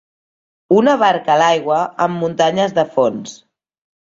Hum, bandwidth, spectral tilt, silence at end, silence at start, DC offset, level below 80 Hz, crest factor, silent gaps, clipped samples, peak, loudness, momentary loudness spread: none; 7.8 kHz; -5 dB/octave; 0.7 s; 0.7 s; under 0.1%; -60 dBFS; 14 dB; none; under 0.1%; -2 dBFS; -15 LUFS; 6 LU